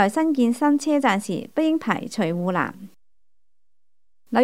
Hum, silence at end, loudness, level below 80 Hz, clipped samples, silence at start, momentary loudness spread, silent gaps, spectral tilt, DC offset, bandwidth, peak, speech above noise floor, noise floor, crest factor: none; 0 s; -22 LUFS; -72 dBFS; under 0.1%; 0 s; 6 LU; none; -5.5 dB/octave; 0.3%; 15.5 kHz; -4 dBFS; 62 dB; -83 dBFS; 20 dB